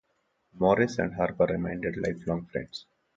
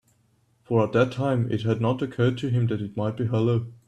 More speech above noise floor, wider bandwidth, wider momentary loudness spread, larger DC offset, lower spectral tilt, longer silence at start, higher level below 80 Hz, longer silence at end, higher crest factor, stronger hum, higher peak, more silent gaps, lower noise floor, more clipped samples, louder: first, 46 dB vs 41 dB; about the same, 7.8 kHz vs 8.4 kHz; first, 12 LU vs 4 LU; neither; second, -7 dB/octave vs -8.5 dB/octave; second, 0.55 s vs 0.7 s; first, -54 dBFS vs -60 dBFS; first, 0.35 s vs 0.15 s; about the same, 20 dB vs 16 dB; neither; about the same, -8 dBFS vs -8 dBFS; neither; first, -74 dBFS vs -65 dBFS; neither; second, -28 LUFS vs -25 LUFS